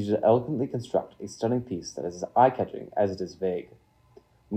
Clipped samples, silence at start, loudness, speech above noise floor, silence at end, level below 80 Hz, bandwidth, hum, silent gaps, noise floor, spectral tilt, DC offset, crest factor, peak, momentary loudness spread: under 0.1%; 0 s; -27 LUFS; 31 dB; 0 s; -64 dBFS; 10 kHz; none; none; -58 dBFS; -7 dB/octave; under 0.1%; 22 dB; -6 dBFS; 12 LU